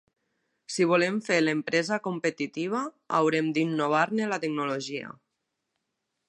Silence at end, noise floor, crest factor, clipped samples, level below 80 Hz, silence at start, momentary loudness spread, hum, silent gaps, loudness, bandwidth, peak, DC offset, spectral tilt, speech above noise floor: 1.15 s; -82 dBFS; 20 dB; under 0.1%; -78 dBFS; 0.7 s; 8 LU; none; none; -27 LUFS; 11 kHz; -8 dBFS; under 0.1%; -5 dB/octave; 55 dB